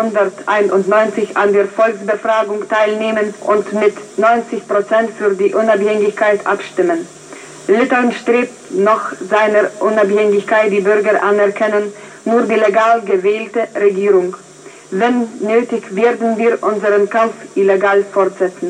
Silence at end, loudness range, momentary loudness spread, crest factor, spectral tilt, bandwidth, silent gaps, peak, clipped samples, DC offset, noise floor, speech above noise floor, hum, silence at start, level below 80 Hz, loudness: 0 s; 2 LU; 5 LU; 14 dB; -5.5 dB/octave; 10 kHz; none; 0 dBFS; under 0.1%; under 0.1%; -34 dBFS; 20 dB; none; 0 s; -66 dBFS; -14 LUFS